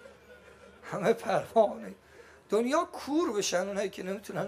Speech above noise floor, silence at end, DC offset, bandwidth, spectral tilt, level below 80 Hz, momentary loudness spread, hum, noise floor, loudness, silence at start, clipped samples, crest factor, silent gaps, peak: 25 dB; 0 s; under 0.1%; 15 kHz; -4 dB/octave; -70 dBFS; 13 LU; none; -54 dBFS; -30 LUFS; 0 s; under 0.1%; 18 dB; none; -12 dBFS